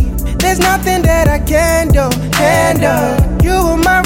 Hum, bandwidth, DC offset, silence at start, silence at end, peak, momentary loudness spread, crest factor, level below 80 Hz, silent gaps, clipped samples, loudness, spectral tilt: none; 17 kHz; under 0.1%; 0 s; 0 s; -2 dBFS; 3 LU; 10 dB; -18 dBFS; none; under 0.1%; -12 LUFS; -5 dB/octave